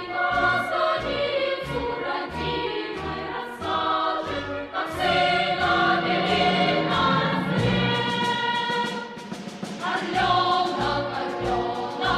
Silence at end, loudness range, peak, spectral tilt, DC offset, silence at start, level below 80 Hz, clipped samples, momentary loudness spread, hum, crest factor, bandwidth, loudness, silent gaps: 0 s; 5 LU; -10 dBFS; -5 dB/octave; under 0.1%; 0 s; -48 dBFS; under 0.1%; 9 LU; none; 14 dB; 13.5 kHz; -24 LUFS; none